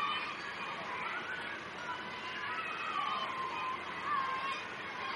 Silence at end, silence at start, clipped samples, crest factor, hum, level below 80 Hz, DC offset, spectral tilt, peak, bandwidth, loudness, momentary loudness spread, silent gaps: 0 s; 0 s; under 0.1%; 14 dB; none; -74 dBFS; under 0.1%; -3 dB/octave; -24 dBFS; 12 kHz; -38 LUFS; 5 LU; none